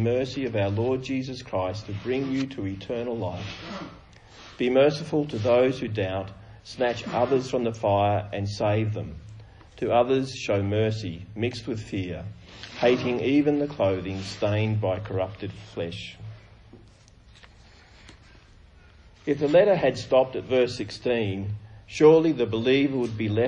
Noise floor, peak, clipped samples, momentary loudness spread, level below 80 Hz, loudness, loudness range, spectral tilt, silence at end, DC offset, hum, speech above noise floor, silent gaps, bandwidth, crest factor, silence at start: -53 dBFS; -6 dBFS; under 0.1%; 16 LU; -54 dBFS; -25 LUFS; 8 LU; -6.5 dB/octave; 0 s; under 0.1%; none; 28 dB; none; 10 kHz; 20 dB; 0 s